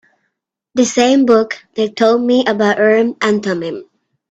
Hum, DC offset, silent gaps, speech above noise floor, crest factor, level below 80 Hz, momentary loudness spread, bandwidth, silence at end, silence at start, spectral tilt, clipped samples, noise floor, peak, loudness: none; under 0.1%; none; 59 dB; 14 dB; -60 dBFS; 10 LU; 8.4 kHz; 0.5 s; 0.75 s; -4.5 dB/octave; under 0.1%; -72 dBFS; 0 dBFS; -14 LUFS